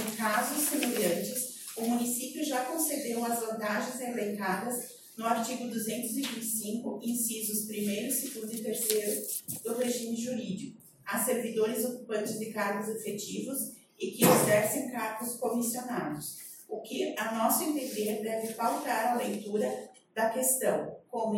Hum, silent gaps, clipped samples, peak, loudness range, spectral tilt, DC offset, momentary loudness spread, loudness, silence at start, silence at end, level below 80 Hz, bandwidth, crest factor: none; none; under 0.1%; -10 dBFS; 4 LU; -3.5 dB/octave; under 0.1%; 9 LU; -31 LUFS; 0 s; 0 s; -76 dBFS; 17 kHz; 22 dB